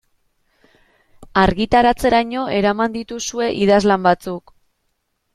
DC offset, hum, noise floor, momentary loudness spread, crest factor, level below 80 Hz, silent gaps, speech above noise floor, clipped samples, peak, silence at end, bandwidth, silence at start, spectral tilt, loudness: under 0.1%; none; -70 dBFS; 10 LU; 18 dB; -40 dBFS; none; 53 dB; under 0.1%; -2 dBFS; 0.95 s; 14 kHz; 1.2 s; -5 dB/octave; -17 LUFS